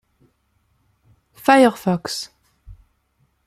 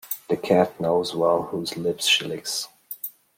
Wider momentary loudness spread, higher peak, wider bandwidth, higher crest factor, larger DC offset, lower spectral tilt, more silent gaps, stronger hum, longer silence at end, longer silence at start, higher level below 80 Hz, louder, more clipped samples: about the same, 15 LU vs 14 LU; first, -2 dBFS vs -6 dBFS; about the same, 15.5 kHz vs 16.5 kHz; about the same, 20 dB vs 20 dB; neither; first, -5 dB/octave vs -3.5 dB/octave; neither; neither; first, 0.75 s vs 0.25 s; first, 1.45 s vs 0.05 s; first, -54 dBFS vs -66 dBFS; first, -18 LUFS vs -23 LUFS; neither